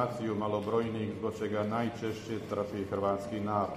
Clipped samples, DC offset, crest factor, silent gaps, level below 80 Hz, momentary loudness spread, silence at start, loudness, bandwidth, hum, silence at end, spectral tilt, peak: under 0.1%; under 0.1%; 16 dB; none; -64 dBFS; 4 LU; 0 s; -34 LUFS; 15 kHz; none; 0 s; -7 dB/octave; -16 dBFS